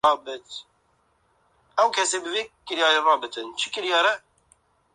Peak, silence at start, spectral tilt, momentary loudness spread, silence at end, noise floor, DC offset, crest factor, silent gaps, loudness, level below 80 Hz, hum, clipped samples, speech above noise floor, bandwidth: -6 dBFS; 0.05 s; 0 dB/octave; 15 LU; 0.75 s; -66 dBFS; under 0.1%; 20 dB; none; -23 LUFS; -70 dBFS; none; under 0.1%; 43 dB; 11.5 kHz